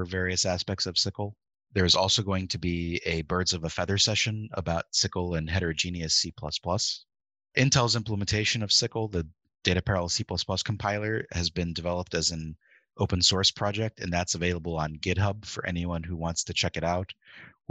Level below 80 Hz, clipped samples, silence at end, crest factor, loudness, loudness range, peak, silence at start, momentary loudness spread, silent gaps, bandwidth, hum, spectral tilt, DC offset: -48 dBFS; under 0.1%; 0.2 s; 24 dB; -27 LUFS; 3 LU; -4 dBFS; 0 s; 10 LU; none; 9.2 kHz; none; -3.5 dB/octave; under 0.1%